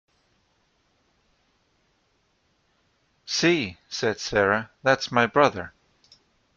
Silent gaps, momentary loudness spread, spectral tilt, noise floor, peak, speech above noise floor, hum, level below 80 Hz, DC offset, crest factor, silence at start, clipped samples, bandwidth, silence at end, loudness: none; 13 LU; -4 dB/octave; -69 dBFS; -4 dBFS; 46 dB; none; -60 dBFS; under 0.1%; 24 dB; 3.25 s; under 0.1%; 7.8 kHz; 0.85 s; -23 LUFS